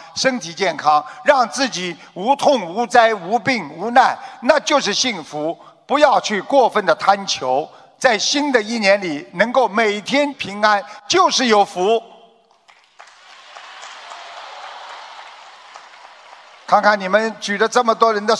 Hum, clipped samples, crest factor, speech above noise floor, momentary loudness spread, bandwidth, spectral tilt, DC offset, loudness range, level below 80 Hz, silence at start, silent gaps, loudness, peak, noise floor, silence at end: none; under 0.1%; 18 dB; 35 dB; 20 LU; 11 kHz; -2.5 dB/octave; under 0.1%; 19 LU; -66 dBFS; 0 s; none; -17 LUFS; 0 dBFS; -52 dBFS; 0 s